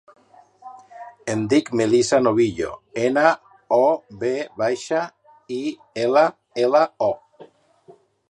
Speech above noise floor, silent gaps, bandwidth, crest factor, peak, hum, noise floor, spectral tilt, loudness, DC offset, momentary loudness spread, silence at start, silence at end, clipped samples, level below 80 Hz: 32 dB; none; 11 kHz; 20 dB; -2 dBFS; none; -52 dBFS; -5 dB/octave; -21 LUFS; under 0.1%; 13 LU; 0.65 s; 0.9 s; under 0.1%; -60 dBFS